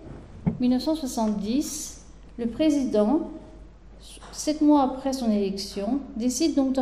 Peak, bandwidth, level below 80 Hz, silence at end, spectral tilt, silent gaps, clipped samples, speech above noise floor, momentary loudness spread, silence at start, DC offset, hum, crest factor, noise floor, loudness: -10 dBFS; 15.5 kHz; -48 dBFS; 0 s; -5 dB/octave; none; under 0.1%; 21 dB; 16 LU; 0 s; under 0.1%; none; 16 dB; -46 dBFS; -25 LUFS